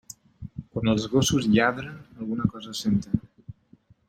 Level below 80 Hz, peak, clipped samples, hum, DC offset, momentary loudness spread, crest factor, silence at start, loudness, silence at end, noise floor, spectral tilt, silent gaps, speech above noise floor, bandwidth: -50 dBFS; -8 dBFS; under 0.1%; none; under 0.1%; 19 LU; 20 dB; 0.1 s; -25 LUFS; 0.55 s; -58 dBFS; -5 dB/octave; none; 34 dB; 16 kHz